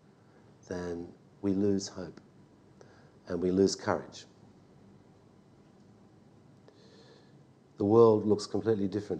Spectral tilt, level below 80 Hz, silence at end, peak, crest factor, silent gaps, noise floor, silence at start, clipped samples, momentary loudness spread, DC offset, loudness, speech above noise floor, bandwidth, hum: -6.5 dB/octave; -70 dBFS; 0 s; -10 dBFS; 22 dB; none; -59 dBFS; 0.7 s; under 0.1%; 22 LU; under 0.1%; -29 LUFS; 31 dB; 9.4 kHz; none